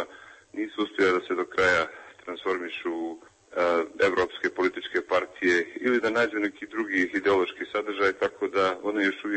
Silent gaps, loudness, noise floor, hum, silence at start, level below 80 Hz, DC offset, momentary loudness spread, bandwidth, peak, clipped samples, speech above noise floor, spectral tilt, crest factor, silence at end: none; -26 LUFS; -49 dBFS; none; 0 s; -64 dBFS; under 0.1%; 10 LU; 8.6 kHz; -10 dBFS; under 0.1%; 23 dB; -4.5 dB/octave; 16 dB; 0 s